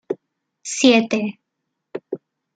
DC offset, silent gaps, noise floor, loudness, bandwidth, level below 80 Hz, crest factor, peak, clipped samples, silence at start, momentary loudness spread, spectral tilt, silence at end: under 0.1%; none; -78 dBFS; -18 LUFS; 9.4 kHz; -66 dBFS; 20 dB; -2 dBFS; under 0.1%; 0.1 s; 21 LU; -3.5 dB/octave; 0.4 s